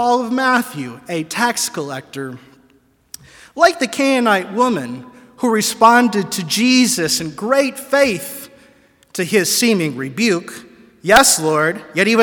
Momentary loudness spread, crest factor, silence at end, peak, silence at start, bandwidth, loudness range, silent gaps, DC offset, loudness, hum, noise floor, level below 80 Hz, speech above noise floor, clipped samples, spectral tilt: 18 LU; 16 dB; 0 s; 0 dBFS; 0 s; 18 kHz; 5 LU; none; under 0.1%; -15 LUFS; none; -55 dBFS; -52 dBFS; 39 dB; under 0.1%; -3 dB/octave